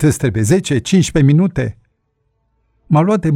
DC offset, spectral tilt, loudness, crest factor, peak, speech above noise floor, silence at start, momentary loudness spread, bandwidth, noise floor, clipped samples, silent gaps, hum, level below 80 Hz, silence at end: under 0.1%; -6.5 dB/octave; -14 LUFS; 14 dB; -2 dBFS; 53 dB; 0 s; 6 LU; 15 kHz; -66 dBFS; under 0.1%; none; none; -38 dBFS; 0 s